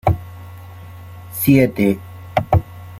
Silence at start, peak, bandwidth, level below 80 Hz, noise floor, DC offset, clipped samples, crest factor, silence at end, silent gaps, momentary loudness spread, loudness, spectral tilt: 0.05 s; -2 dBFS; 16.5 kHz; -38 dBFS; -36 dBFS; under 0.1%; under 0.1%; 18 dB; 0 s; none; 23 LU; -18 LUFS; -7 dB/octave